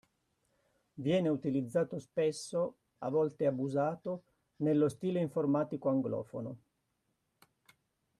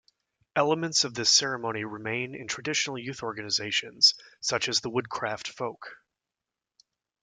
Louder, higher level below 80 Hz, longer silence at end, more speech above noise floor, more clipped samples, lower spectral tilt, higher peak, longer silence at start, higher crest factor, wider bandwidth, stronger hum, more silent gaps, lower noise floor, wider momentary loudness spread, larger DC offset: second, -34 LUFS vs -26 LUFS; second, -76 dBFS vs -70 dBFS; first, 1.65 s vs 1.3 s; second, 48 dB vs 60 dB; neither; first, -7 dB/octave vs -1.5 dB/octave; second, -20 dBFS vs -6 dBFS; first, 0.95 s vs 0.55 s; second, 16 dB vs 24 dB; about the same, 12.5 kHz vs 11.5 kHz; neither; neither; second, -81 dBFS vs -89 dBFS; second, 11 LU vs 14 LU; neither